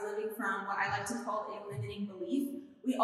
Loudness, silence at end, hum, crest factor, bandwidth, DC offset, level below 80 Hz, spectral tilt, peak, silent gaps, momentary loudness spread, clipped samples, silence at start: -37 LUFS; 0 s; none; 20 dB; 14.5 kHz; under 0.1%; -72 dBFS; -5 dB/octave; -16 dBFS; none; 7 LU; under 0.1%; 0 s